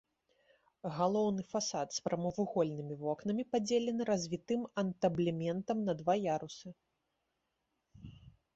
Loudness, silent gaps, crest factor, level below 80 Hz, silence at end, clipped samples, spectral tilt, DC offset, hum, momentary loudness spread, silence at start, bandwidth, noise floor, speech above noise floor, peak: -35 LUFS; none; 18 dB; -70 dBFS; 0.25 s; under 0.1%; -6 dB/octave; under 0.1%; none; 12 LU; 0.85 s; 8 kHz; -84 dBFS; 49 dB; -18 dBFS